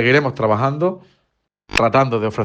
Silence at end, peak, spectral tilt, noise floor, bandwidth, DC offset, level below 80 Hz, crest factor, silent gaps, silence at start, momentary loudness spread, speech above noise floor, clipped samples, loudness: 0 s; -2 dBFS; -6 dB/octave; -70 dBFS; 10 kHz; under 0.1%; -44 dBFS; 16 dB; none; 0 s; 7 LU; 53 dB; under 0.1%; -17 LUFS